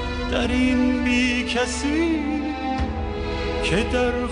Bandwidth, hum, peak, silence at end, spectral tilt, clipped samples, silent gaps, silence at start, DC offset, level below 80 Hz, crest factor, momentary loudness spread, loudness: 10 kHz; none; -8 dBFS; 0 s; -5 dB/octave; under 0.1%; none; 0 s; under 0.1%; -32 dBFS; 14 dB; 6 LU; -22 LUFS